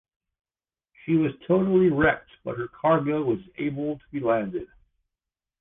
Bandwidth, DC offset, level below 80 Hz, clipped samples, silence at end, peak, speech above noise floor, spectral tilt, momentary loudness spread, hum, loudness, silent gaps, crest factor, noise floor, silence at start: 3.8 kHz; under 0.1%; -54 dBFS; under 0.1%; 0.95 s; -8 dBFS; over 66 dB; -11 dB/octave; 13 LU; none; -25 LUFS; none; 18 dB; under -90 dBFS; 1.05 s